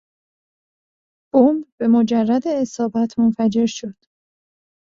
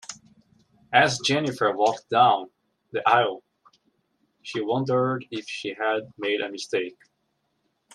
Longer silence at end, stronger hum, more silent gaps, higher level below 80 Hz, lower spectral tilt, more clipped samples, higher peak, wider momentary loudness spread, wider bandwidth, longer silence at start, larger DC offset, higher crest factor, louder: about the same, 0.95 s vs 1.05 s; neither; first, 1.72-1.78 s vs none; first, -62 dBFS vs -70 dBFS; first, -6.5 dB/octave vs -4 dB/octave; neither; about the same, -2 dBFS vs -4 dBFS; second, 7 LU vs 14 LU; second, 7.4 kHz vs 12 kHz; first, 1.35 s vs 0.1 s; neither; about the same, 18 dB vs 22 dB; first, -18 LUFS vs -24 LUFS